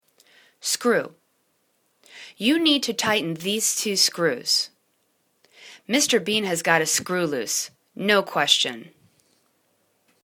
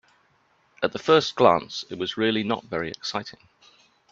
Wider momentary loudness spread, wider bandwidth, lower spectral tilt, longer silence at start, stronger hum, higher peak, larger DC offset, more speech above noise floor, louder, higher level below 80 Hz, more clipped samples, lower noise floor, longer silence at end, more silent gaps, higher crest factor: about the same, 12 LU vs 12 LU; first, 19 kHz vs 7.6 kHz; second, -2 dB/octave vs -4.5 dB/octave; second, 0.65 s vs 0.8 s; neither; about the same, -2 dBFS vs -2 dBFS; neither; first, 46 dB vs 41 dB; first, -21 LUFS vs -24 LUFS; second, -72 dBFS vs -64 dBFS; neither; first, -69 dBFS vs -64 dBFS; first, 1.4 s vs 0.8 s; neither; about the same, 22 dB vs 24 dB